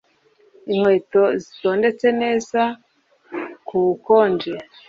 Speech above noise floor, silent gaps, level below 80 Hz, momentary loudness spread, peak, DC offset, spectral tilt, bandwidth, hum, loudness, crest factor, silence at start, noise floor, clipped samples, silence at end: 39 dB; none; -64 dBFS; 15 LU; -4 dBFS; under 0.1%; -6 dB/octave; 7.6 kHz; none; -19 LUFS; 16 dB; 0.65 s; -57 dBFS; under 0.1%; 0.25 s